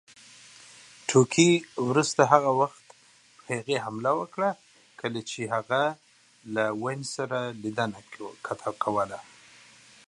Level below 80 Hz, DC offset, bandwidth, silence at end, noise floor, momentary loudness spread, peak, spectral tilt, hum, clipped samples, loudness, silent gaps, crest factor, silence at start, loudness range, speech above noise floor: -72 dBFS; under 0.1%; 11.5 kHz; 0.85 s; -57 dBFS; 18 LU; -2 dBFS; -4.5 dB/octave; none; under 0.1%; -27 LUFS; none; 26 dB; 1.1 s; 7 LU; 31 dB